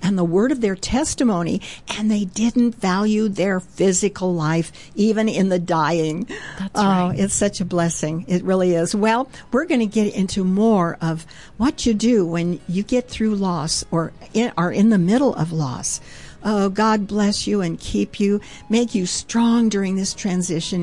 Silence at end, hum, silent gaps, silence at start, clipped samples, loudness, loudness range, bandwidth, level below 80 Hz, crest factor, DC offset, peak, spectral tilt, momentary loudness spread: 0 s; none; none; 0 s; under 0.1%; -20 LUFS; 1 LU; 11.5 kHz; -44 dBFS; 12 dB; 0.5%; -8 dBFS; -5 dB/octave; 7 LU